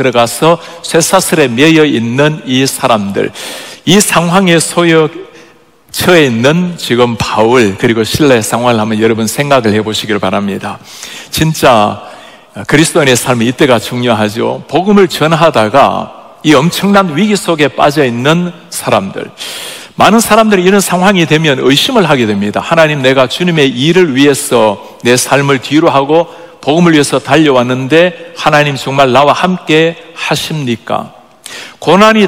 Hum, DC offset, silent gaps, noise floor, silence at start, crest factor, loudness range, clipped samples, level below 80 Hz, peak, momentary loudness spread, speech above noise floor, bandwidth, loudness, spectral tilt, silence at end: none; under 0.1%; none; -42 dBFS; 0 s; 10 dB; 3 LU; 3%; -44 dBFS; 0 dBFS; 11 LU; 33 dB; over 20 kHz; -9 LUFS; -4.5 dB/octave; 0 s